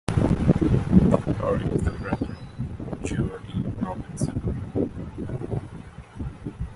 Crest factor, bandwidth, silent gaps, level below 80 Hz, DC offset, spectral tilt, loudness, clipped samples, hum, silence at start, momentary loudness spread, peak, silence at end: 22 dB; 11.5 kHz; none; -36 dBFS; under 0.1%; -8 dB/octave; -26 LUFS; under 0.1%; none; 0.1 s; 16 LU; -2 dBFS; 0 s